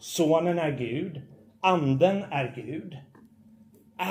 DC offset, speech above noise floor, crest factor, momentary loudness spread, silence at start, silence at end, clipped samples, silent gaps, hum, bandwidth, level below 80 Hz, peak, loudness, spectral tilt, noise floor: under 0.1%; 30 dB; 20 dB; 21 LU; 0 s; 0 s; under 0.1%; none; none; 16 kHz; -70 dBFS; -8 dBFS; -27 LUFS; -6 dB/octave; -56 dBFS